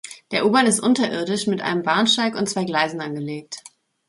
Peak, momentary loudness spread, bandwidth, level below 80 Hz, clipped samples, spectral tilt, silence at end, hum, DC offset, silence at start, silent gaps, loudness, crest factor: -4 dBFS; 13 LU; 12 kHz; -66 dBFS; under 0.1%; -3.5 dB/octave; 0.5 s; none; under 0.1%; 0.05 s; none; -20 LUFS; 18 dB